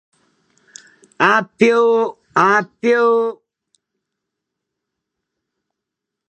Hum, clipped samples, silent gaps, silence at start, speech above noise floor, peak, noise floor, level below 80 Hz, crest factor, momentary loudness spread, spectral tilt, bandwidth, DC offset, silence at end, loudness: none; under 0.1%; none; 1.2 s; 67 dB; 0 dBFS; -82 dBFS; -70 dBFS; 20 dB; 5 LU; -5 dB/octave; 8.6 kHz; under 0.1%; 2.95 s; -15 LUFS